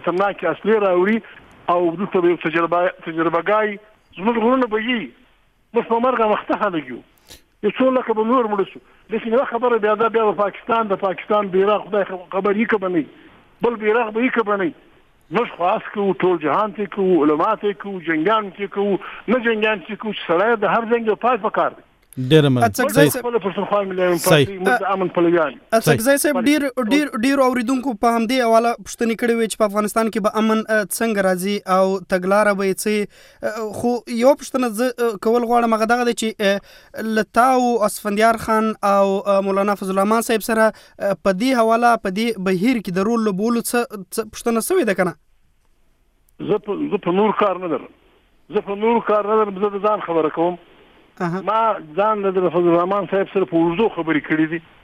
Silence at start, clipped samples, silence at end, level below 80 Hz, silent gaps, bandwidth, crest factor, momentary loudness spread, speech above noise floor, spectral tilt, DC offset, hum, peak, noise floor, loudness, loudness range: 0 s; under 0.1%; 0.25 s; -56 dBFS; none; 16 kHz; 18 dB; 8 LU; 40 dB; -5 dB/octave; under 0.1%; none; 0 dBFS; -58 dBFS; -19 LUFS; 4 LU